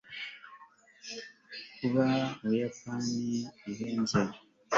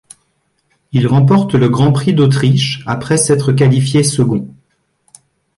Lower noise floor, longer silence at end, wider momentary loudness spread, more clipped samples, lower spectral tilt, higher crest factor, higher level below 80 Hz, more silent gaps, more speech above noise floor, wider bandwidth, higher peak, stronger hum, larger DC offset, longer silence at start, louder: second, -57 dBFS vs -63 dBFS; second, 0 s vs 1.1 s; first, 16 LU vs 7 LU; neither; about the same, -5.5 dB/octave vs -6 dB/octave; first, 22 dB vs 12 dB; second, -66 dBFS vs -46 dBFS; neither; second, 26 dB vs 51 dB; second, 7.8 kHz vs 11.5 kHz; second, -12 dBFS vs -2 dBFS; neither; neither; second, 0.05 s vs 0.95 s; second, -33 LUFS vs -12 LUFS